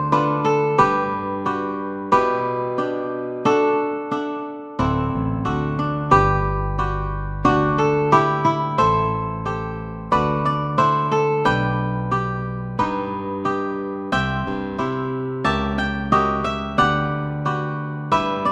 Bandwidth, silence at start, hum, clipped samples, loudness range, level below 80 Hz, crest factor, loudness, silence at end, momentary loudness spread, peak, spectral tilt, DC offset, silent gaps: 8.8 kHz; 0 s; none; under 0.1%; 4 LU; -36 dBFS; 18 dB; -21 LUFS; 0 s; 9 LU; -2 dBFS; -7 dB/octave; under 0.1%; none